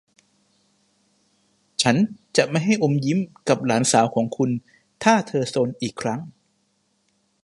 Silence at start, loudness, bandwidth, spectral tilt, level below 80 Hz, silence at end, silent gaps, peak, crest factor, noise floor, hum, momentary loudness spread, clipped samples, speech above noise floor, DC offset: 1.8 s; -22 LUFS; 11.5 kHz; -4.5 dB/octave; -64 dBFS; 1.15 s; none; 0 dBFS; 22 dB; -68 dBFS; none; 10 LU; under 0.1%; 47 dB; under 0.1%